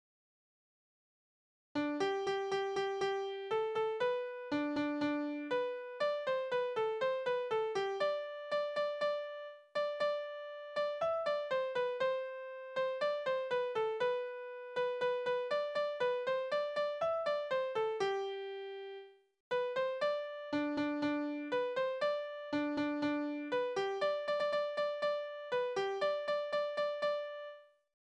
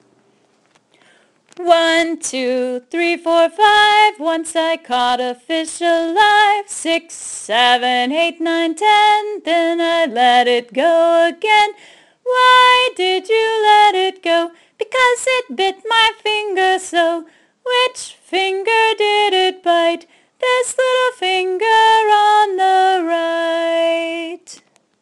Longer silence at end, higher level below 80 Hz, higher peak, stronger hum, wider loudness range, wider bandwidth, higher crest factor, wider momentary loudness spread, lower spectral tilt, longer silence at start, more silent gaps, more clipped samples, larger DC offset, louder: about the same, 0.35 s vs 0.45 s; second, -80 dBFS vs -62 dBFS; second, -22 dBFS vs 0 dBFS; neither; about the same, 2 LU vs 3 LU; second, 9.8 kHz vs 12 kHz; about the same, 14 dB vs 16 dB; second, 6 LU vs 10 LU; first, -4.5 dB/octave vs -0.5 dB/octave; first, 1.75 s vs 1.6 s; first, 19.40-19.51 s vs none; neither; neither; second, -37 LUFS vs -14 LUFS